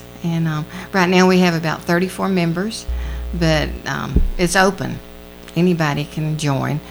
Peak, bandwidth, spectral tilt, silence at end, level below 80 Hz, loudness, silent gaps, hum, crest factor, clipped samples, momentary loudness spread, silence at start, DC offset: 0 dBFS; over 20 kHz; -5.5 dB/octave; 0 s; -28 dBFS; -18 LUFS; none; 60 Hz at -35 dBFS; 18 dB; under 0.1%; 13 LU; 0 s; under 0.1%